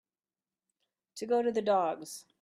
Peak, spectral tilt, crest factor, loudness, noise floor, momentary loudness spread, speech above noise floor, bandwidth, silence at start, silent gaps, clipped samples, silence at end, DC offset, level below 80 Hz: -16 dBFS; -4.5 dB/octave; 18 dB; -30 LUFS; under -90 dBFS; 16 LU; over 59 dB; 15 kHz; 1.15 s; none; under 0.1%; 0.2 s; under 0.1%; -80 dBFS